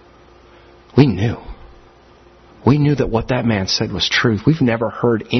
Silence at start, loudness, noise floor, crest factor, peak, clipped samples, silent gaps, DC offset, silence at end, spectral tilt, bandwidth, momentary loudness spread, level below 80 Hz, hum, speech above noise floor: 0.95 s; -17 LUFS; -47 dBFS; 18 dB; 0 dBFS; under 0.1%; none; under 0.1%; 0 s; -6 dB/octave; 6.4 kHz; 6 LU; -40 dBFS; none; 31 dB